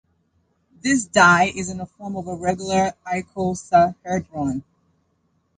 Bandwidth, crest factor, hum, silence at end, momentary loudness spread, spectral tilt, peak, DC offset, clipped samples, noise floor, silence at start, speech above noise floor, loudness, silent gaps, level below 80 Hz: 9.6 kHz; 20 dB; none; 0.95 s; 16 LU; -4.5 dB/octave; -2 dBFS; under 0.1%; under 0.1%; -67 dBFS; 0.85 s; 47 dB; -20 LUFS; none; -50 dBFS